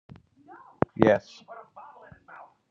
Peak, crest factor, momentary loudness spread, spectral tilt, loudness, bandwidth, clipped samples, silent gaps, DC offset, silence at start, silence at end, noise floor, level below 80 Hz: 0 dBFS; 30 dB; 27 LU; -8 dB/octave; -25 LUFS; 7.4 kHz; under 0.1%; none; under 0.1%; 1 s; 0.9 s; -52 dBFS; -60 dBFS